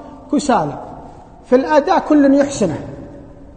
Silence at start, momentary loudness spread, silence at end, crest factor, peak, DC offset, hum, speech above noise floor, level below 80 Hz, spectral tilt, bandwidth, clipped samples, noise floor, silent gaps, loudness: 0 s; 22 LU; 0.1 s; 16 dB; 0 dBFS; under 0.1%; none; 23 dB; -44 dBFS; -5.5 dB/octave; 9.4 kHz; under 0.1%; -37 dBFS; none; -15 LUFS